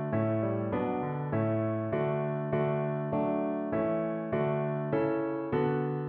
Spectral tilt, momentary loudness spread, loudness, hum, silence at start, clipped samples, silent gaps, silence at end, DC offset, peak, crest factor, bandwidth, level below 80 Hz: -8.5 dB/octave; 2 LU; -31 LUFS; none; 0 s; under 0.1%; none; 0 s; under 0.1%; -16 dBFS; 14 dB; 4.3 kHz; -62 dBFS